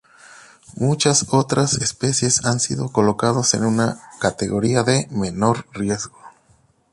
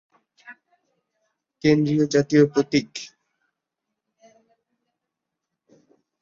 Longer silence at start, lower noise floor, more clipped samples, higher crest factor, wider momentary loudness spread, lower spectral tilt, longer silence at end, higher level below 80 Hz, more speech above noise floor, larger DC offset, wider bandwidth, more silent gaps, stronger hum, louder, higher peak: second, 0.3 s vs 0.5 s; second, -58 dBFS vs -83 dBFS; neither; about the same, 18 dB vs 22 dB; second, 7 LU vs 18 LU; second, -4 dB/octave vs -6 dB/octave; second, 0.65 s vs 3.15 s; first, -50 dBFS vs -62 dBFS; second, 39 dB vs 64 dB; neither; first, 11.5 kHz vs 7.6 kHz; neither; neither; about the same, -19 LUFS vs -20 LUFS; about the same, -2 dBFS vs -4 dBFS